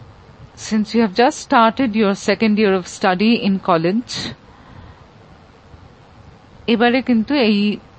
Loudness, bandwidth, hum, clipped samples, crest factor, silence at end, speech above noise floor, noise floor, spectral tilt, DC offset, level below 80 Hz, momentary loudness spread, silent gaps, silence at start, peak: -17 LUFS; 8.8 kHz; none; under 0.1%; 18 dB; 0.2 s; 29 dB; -45 dBFS; -5.5 dB/octave; under 0.1%; -50 dBFS; 8 LU; none; 0 s; 0 dBFS